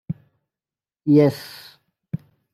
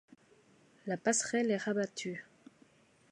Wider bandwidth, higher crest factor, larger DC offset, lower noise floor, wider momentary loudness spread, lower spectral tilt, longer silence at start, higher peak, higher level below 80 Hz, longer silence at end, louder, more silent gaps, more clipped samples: first, 14.5 kHz vs 11 kHz; about the same, 20 dB vs 22 dB; neither; first, under -90 dBFS vs -66 dBFS; first, 21 LU vs 13 LU; first, -8 dB/octave vs -3.5 dB/octave; second, 0.1 s vs 0.85 s; first, -4 dBFS vs -16 dBFS; first, -64 dBFS vs -82 dBFS; second, 0.4 s vs 0.9 s; first, -18 LUFS vs -34 LUFS; neither; neither